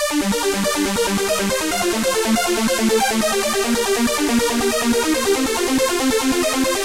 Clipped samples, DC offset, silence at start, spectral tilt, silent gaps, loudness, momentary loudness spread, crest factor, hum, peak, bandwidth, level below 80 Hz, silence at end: under 0.1%; 0.5%; 0 s; -2.5 dB/octave; none; -18 LUFS; 2 LU; 12 dB; none; -6 dBFS; 16 kHz; -42 dBFS; 0 s